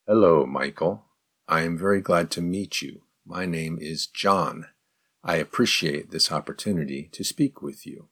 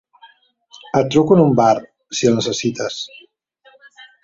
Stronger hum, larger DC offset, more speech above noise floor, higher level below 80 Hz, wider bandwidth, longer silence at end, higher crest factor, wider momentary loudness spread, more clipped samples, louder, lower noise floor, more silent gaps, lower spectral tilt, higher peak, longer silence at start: neither; neither; first, 43 dB vs 37 dB; about the same, -60 dBFS vs -56 dBFS; first, 18.5 kHz vs 7.8 kHz; about the same, 0.1 s vs 0.2 s; about the same, 20 dB vs 18 dB; about the same, 14 LU vs 13 LU; neither; second, -25 LUFS vs -17 LUFS; first, -68 dBFS vs -53 dBFS; neither; about the same, -4.5 dB/octave vs -5.5 dB/octave; second, -6 dBFS vs -2 dBFS; second, 0.05 s vs 0.95 s